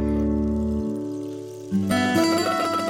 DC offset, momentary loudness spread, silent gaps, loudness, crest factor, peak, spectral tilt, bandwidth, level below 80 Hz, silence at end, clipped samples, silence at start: under 0.1%; 12 LU; none; -23 LUFS; 16 dB; -8 dBFS; -5.5 dB/octave; 16.5 kHz; -38 dBFS; 0 s; under 0.1%; 0 s